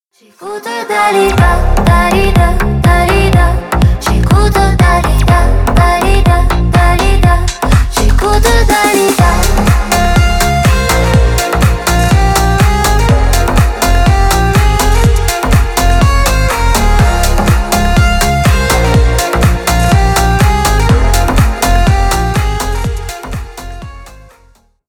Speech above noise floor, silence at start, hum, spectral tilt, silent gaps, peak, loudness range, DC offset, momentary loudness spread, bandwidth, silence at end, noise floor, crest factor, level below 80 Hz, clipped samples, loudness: 37 dB; 0.4 s; none; -5 dB/octave; none; 0 dBFS; 1 LU; under 0.1%; 4 LU; 19 kHz; 0.75 s; -47 dBFS; 8 dB; -12 dBFS; under 0.1%; -10 LUFS